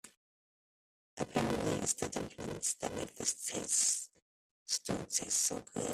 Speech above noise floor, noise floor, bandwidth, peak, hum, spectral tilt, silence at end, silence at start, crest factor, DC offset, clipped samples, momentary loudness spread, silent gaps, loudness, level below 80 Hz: over 53 dB; under -90 dBFS; 15.5 kHz; -18 dBFS; none; -2.5 dB/octave; 0 s; 0.05 s; 20 dB; under 0.1%; under 0.1%; 11 LU; 0.17-1.17 s, 4.22-4.66 s; -35 LUFS; -64 dBFS